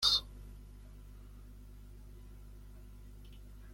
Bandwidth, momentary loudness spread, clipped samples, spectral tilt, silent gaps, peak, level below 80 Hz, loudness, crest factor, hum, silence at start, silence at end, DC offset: 16.5 kHz; 10 LU; under 0.1%; -1.5 dB/octave; none; -16 dBFS; -52 dBFS; -31 LUFS; 26 dB; 50 Hz at -50 dBFS; 0 s; 0 s; under 0.1%